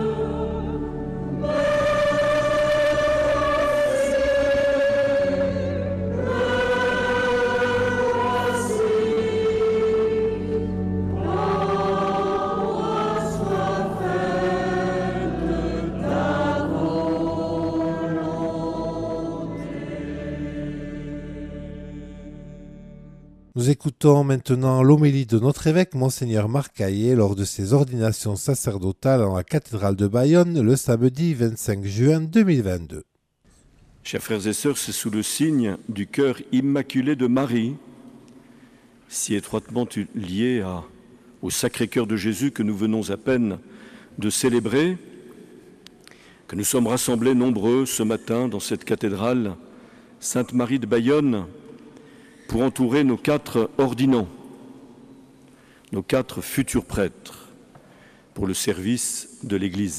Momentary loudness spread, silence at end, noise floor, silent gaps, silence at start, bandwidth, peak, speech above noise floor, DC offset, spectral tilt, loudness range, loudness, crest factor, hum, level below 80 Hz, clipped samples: 11 LU; 0 s; -60 dBFS; none; 0 s; 14.5 kHz; -4 dBFS; 38 dB; under 0.1%; -5.5 dB/octave; 8 LU; -22 LUFS; 18 dB; none; -44 dBFS; under 0.1%